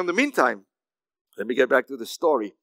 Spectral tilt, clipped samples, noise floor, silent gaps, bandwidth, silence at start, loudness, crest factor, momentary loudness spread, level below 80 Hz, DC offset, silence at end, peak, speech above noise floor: -3.5 dB/octave; under 0.1%; under -90 dBFS; 1.21-1.25 s; 16 kHz; 0 s; -23 LUFS; 22 dB; 14 LU; under -90 dBFS; under 0.1%; 0.1 s; -2 dBFS; over 67 dB